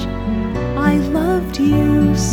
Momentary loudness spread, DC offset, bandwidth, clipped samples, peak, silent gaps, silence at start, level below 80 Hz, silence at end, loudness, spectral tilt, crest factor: 7 LU; under 0.1%; 17.5 kHz; under 0.1%; -2 dBFS; none; 0 s; -28 dBFS; 0 s; -17 LUFS; -6.5 dB/octave; 14 dB